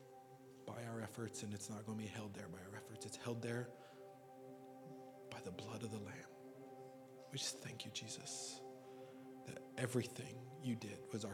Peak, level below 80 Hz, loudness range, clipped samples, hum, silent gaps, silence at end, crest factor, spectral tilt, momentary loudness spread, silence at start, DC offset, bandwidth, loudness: -26 dBFS; -86 dBFS; 5 LU; under 0.1%; none; none; 0 s; 22 dB; -4.5 dB/octave; 14 LU; 0 s; under 0.1%; 17.5 kHz; -49 LUFS